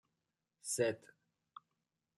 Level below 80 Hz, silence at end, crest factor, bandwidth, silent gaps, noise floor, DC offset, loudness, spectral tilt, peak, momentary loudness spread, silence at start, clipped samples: -84 dBFS; 1.2 s; 22 dB; 14 kHz; none; -88 dBFS; under 0.1%; -39 LUFS; -3.5 dB/octave; -22 dBFS; 24 LU; 0.65 s; under 0.1%